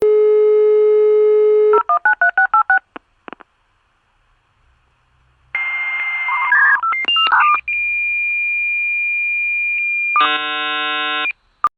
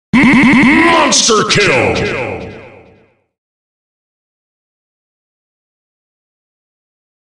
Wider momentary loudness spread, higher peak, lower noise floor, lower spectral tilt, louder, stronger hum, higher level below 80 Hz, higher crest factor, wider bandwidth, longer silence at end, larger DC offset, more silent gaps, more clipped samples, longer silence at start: second, 6 LU vs 14 LU; about the same, -2 dBFS vs 0 dBFS; first, -61 dBFS vs -49 dBFS; about the same, -3 dB/octave vs -3.5 dB/octave; second, -15 LUFS vs -9 LUFS; neither; second, -60 dBFS vs -40 dBFS; about the same, 14 dB vs 14 dB; second, 4.7 kHz vs 11 kHz; second, 0.1 s vs 4.6 s; neither; neither; neither; second, 0 s vs 0.15 s